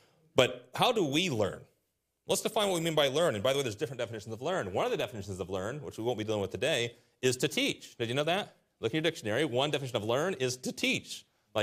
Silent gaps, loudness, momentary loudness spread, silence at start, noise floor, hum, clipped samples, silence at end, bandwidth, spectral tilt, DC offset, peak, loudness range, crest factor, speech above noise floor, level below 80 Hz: none; -31 LUFS; 10 LU; 0.35 s; -80 dBFS; none; under 0.1%; 0 s; 15.5 kHz; -4 dB/octave; under 0.1%; -6 dBFS; 4 LU; 26 dB; 48 dB; -70 dBFS